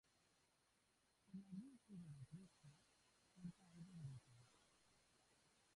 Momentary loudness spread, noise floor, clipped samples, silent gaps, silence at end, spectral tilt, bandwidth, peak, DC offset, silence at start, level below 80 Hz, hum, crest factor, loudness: 6 LU; -83 dBFS; under 0.1%; none; 0 s; -6.5 dB/octave; 11 kHz; -46 dBFS; under 0.1%; 0.05 s; -86 dBFS; none; 18 dB; -61 LUFS